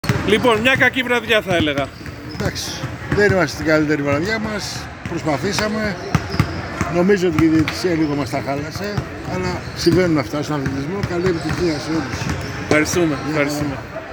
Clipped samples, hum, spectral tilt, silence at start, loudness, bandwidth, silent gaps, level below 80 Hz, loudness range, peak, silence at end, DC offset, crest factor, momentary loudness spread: under 0.1%; none; -5 dB/octave; 0.05 s; -19 LUFS; over 20 kHz; none; -38 dBFS; 3 LU; 0 dBFS; 0 s; under 0.1%; 18 dB; 10 LU